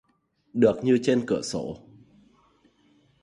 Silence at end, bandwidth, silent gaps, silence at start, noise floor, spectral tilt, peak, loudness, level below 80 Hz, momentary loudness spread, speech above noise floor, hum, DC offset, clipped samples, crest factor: 1.45 s; 11.5 kHz; none; 0.55 s; -68 dBFS; -6 dB/octave; -6 dBFS; -24 LUFS; -62 dBFS; 15 LU; 45 dB; none; under 0.1%; under 0.1%; 20 dB